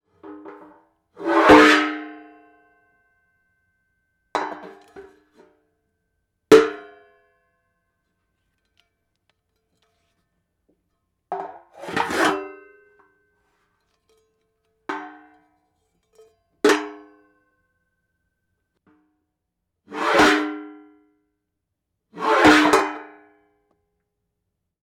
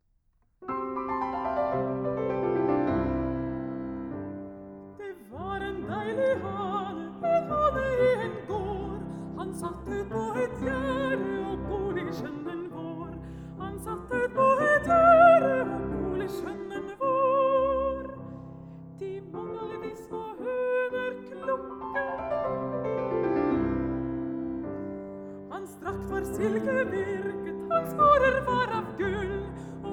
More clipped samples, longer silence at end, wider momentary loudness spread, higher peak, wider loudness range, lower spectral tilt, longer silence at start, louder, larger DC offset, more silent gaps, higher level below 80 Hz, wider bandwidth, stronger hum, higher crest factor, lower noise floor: neither; first, 1.8 s vs 0 s; first, 26 LU vs 16 LU; first, -4 dBFS vs -8 dBFS; first, 18 LU vs 10 LU; second, -3.5 dB/octave vs -7 dB/octave; second, 0.25 s vs 0.6 s; first, -18 LUFS vs -28 LUFS; neither; neither; second, -56 dBFS vs -48 dBFS; about the same, 17 kHz vs 17.5 kHz; neither; about the same, 22 dB vs 22 dB; first, -79 dBFS vs -68 dBFS